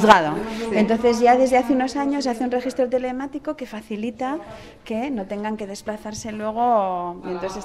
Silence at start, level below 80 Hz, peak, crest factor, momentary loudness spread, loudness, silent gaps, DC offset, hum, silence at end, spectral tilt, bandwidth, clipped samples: 0 s; -50 dBFS; 0 dBFS; 20 dB; 15 LU; -22 LUFS; none; under 0.1%; none; 0 s; -5 dB/octave; 14.5 kHz; under 0.1%